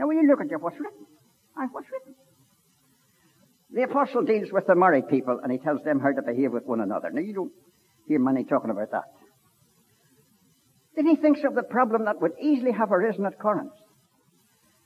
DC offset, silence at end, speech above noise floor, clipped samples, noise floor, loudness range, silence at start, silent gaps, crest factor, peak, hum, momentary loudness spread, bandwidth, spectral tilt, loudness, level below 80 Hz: under 0.1%; 1.15 s; 40 dB; under 0.1%; -64 dBFS; 6 LU; 0 s; none; 20 dB; -6 dBFS; none; 14 LU; 13.5 kHz; -8 dB/octave; -25 LUFS; -82 dBFS